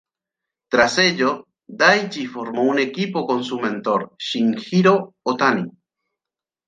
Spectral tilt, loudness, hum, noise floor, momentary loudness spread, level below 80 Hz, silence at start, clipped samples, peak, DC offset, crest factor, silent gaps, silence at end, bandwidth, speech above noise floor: -4.5 dB/octave; -19 LUFS; none; -89 dBFS; 10 LU; -62 dBFS; 0.7 s; under 0.1%; -2 dBFS; under 0.1%; 20 dB; none; 1 s; 9.6 kHz; 69 dB